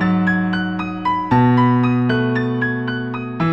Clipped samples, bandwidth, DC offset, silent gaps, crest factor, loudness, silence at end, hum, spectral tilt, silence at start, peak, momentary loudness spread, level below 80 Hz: under 0.1%; 5.8 kHz; 0.4%; none; 14 dB; -18 LUFS; 0 s; none; -9 dB/octave; 0 s; -2 dBFS; 9 LU; -48 dBFS